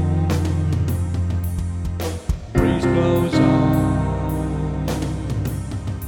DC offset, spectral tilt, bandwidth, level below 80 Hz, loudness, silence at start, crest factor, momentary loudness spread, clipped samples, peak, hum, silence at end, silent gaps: under 0.1%; -7.5 dB/octave; 18.5 kHz; -30 dBFS; -21 LUFS; 0 s; 16 dB; 9 LU; under 0.1%; -4 dBFS; none; 0 s; none